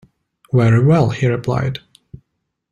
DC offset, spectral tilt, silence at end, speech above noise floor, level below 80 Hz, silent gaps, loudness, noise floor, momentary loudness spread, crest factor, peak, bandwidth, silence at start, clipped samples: under 0.1%; -8 dB/octave; 0.95 s; 59 dB; -46 dBFS; none; -16 LUFS; -73 dBFS; 10 LU; 14 dB; -2 dBFS; 8.6 kHz; 0.55 s; under 0.1%